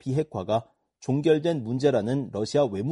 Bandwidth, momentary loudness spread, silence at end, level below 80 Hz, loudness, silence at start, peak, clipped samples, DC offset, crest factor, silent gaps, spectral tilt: 11.5 kHz; 6 LU; 0 s; -62 dBFS; -26 LUFS; 0.05 s; -10 dBFS; under 0.1%; under 0.1%; 16 dB; none; -7 dB/octave